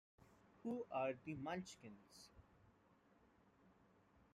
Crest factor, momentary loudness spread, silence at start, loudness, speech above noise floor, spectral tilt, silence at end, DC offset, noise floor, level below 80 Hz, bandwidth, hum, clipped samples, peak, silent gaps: 20 dB; 19 LU; 0.2 s; -48 LUFS; 26 dB; -5.5 dB/octave; 0.65 s; under 0.1%; -74 dBFS; -80 dBFS; 14 kHz; none; under 0.1%; -32 dBFS; none